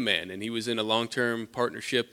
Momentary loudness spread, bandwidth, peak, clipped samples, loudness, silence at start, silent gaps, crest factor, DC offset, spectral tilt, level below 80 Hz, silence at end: 5 LU; 16.5 kHz; -8 dBFS; under 0.1%; -29 LUFS; 0 s; none; 20 dB; under 0.1%; -3.5 dB/octave; -70 dBFS; 0.05 s